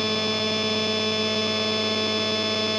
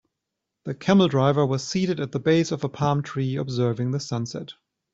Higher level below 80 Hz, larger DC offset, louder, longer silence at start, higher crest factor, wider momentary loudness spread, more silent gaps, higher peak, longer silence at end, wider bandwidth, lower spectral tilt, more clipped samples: second, -70 dBFS vs -60 dBFS; neither; about the same, -23 LUFS vs -23 LUFS; second, 0 s vs 0.65 s; second, 12 dB vs 18 dB; second, 0 LU vs 13 LU; neither; second, -12 dBFS vs -6 dBFS; second, 0 s vs 0.4 s; first, 9.8 kHz vs 8 kHz; second, -3.5 dB/octave vs -6.5 dB/octave; neither